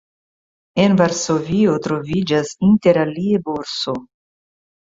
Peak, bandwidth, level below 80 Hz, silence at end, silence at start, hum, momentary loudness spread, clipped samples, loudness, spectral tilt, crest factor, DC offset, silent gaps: -2 dBFS; 7.8 kHz; -52 dBFS; 0.8 s; 0.75 s; none; 9 LU; under 0.1%; -18 LUFS; -5.5 dB/octave; 16 dB; under 0.1%; none